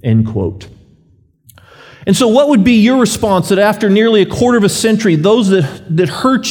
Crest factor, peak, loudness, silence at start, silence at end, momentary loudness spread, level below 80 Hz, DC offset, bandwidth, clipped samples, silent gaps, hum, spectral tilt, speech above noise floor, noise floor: 12 dB; 0 dBFS; -11 LUFS; 0.05 s; 0 s; 7 LU; -44 dBFS; under 0.1%; 19 kHz; under 0.1%; none; none; -5.5 dB/octave; 40 dB; -51 dBFS